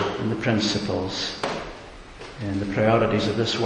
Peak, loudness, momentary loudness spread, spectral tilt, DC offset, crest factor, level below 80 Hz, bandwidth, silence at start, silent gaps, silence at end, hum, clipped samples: -6 dBFS; -24 LUFS; 19 LU; -5.5 dB/octave; under 0.1%; 18 dB; -46 dBFS; 10.5 kHz; 0 s; none; 0 s; none; under 0.1%